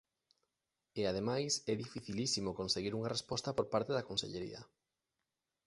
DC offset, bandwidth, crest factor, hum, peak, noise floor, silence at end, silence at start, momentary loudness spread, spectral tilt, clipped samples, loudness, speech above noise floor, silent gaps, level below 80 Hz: under 0.1%; 11.5 kHz; 20 dB; none; -20 dBFS; -89 dBFS; 1 s; 0.95 s; 9 LU; -4 dB/octave; under 0.1%; -38 LUFS; 51 dB; none; -66 dBFS